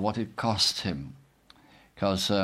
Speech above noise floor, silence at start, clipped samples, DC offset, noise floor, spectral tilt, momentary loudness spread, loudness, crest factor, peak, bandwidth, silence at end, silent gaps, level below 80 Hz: 30 dB; 0 s; under 0.1%; under 0.1%; -58 dBFS; -4 dB/octave; 12 LU; -28 LUFS; 18 dB; -12 dBFS; 16 kHz; 0 s; none; -56 dBFS